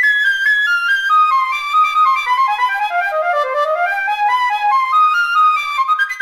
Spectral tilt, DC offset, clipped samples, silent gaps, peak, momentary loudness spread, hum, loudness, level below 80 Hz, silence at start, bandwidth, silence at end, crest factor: 2 dB/octave; under 0.1%; under 0.1%; none; -4 dBFS; 5 LU; none; -14 LUFS; -62 dBFS; 0 s; 15.5 kHz; 0 s; 10 dB